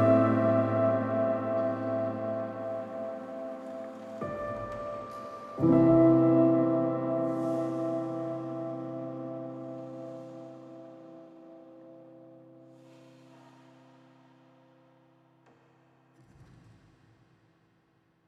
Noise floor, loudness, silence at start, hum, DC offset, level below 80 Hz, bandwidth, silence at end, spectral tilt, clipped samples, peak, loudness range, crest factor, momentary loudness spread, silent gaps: -69 dBFS; -29 LUFS; 0 s; none; under 0.1%; -64 dBFS; 5.6 kHz; 1.85 s; -10 dB/octave; under 0.1%; -12 dBFS; 21 LU; 20 dB; 24 LU; none